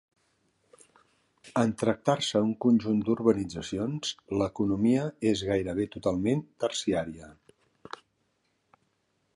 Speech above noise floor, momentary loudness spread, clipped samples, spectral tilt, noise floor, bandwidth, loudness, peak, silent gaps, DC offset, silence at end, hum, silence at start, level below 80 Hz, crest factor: 47 dB; 9 LU; under 0.1%; -5.5 dB/octave; -74 dBFS; 11.5 kHz; -28 LUFS; -8 dBFS; none; under 0.1%; 2.05 s; none; 1.45 s; -56 dBFS; 20 dB